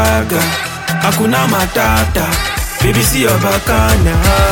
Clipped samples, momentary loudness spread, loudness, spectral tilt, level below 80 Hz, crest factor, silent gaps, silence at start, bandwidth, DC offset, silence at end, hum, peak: under 0.1%; 4 LU; -12 LUFS; -4.5 dB/octave; -20 dBFS; 12 dB; none; 0 s; 19 kHz; under 0.1%; 0 s; none; 0 dBFS